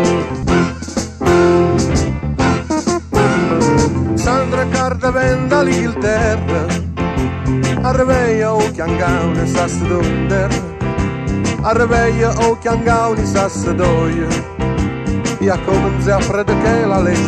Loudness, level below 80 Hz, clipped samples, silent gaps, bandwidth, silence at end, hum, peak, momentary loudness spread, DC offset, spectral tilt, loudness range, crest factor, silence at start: -15 LUFS; -28 dBFS; under 0.1%; none; 13 kHz; 0 s; none; 0 dBFS; 6 LU; under 0.1%; -6 dB/octave; 2 LU; 14 dB; 0 s